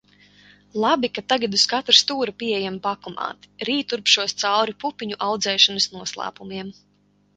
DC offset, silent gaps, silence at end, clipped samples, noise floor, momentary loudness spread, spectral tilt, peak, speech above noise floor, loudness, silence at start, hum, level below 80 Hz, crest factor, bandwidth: under 0.1%; none; 0.65 s; under 0.1%; -62 dBFS; 16 LU; -2 dB/octave; 0 dBFS; 39 dB; -20 LUFS; 0.75 s; 50 Hz at -50 dBFS; -66 dBFS; 24 dB; 11 kHz